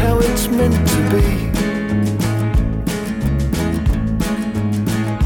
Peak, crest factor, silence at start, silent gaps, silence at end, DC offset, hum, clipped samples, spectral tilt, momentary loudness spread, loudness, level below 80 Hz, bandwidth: -4 dBFS; 14 dB; 0 s; none; 0 s; under 0.1%; none; under 0.1%; -6 dB/octave; 5 LU; -18 LUFS; -24 dBFS; 19.5 kHz